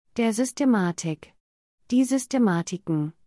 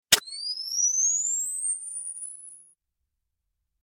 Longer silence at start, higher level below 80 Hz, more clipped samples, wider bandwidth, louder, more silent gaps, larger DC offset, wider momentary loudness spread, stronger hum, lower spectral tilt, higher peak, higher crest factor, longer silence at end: about the same, 0.15 s vs 0.1 s; about the same, -68 dBFS vs -68 dBFS; neither; second, 12 kHz vs 16.5 kHz; about the same, -24 LUFS vs -25 LUFS; first, 1.40-1.78 s vs none; neither; second, 8 LU vs 16 LU; neither; first, -5.5 dB/octave vs 2.5 dB/octave; second, -12 dBFS vs -2 dBFS; second, 14 dB vs 28 dB; second, 0.15 s vs 1.2 s